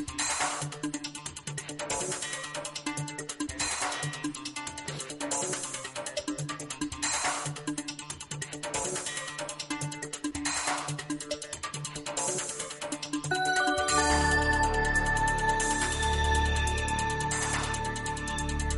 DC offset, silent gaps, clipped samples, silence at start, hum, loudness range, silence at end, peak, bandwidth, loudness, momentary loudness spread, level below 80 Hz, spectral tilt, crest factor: under 0.1%; none; under 0.1%; 0 s; none; 7 LU; 0 s; -12 dBFS; 11.5 kHz; -31 LUFS; 10 LU; -40 dBFS; -3 dB/octave; 18 dB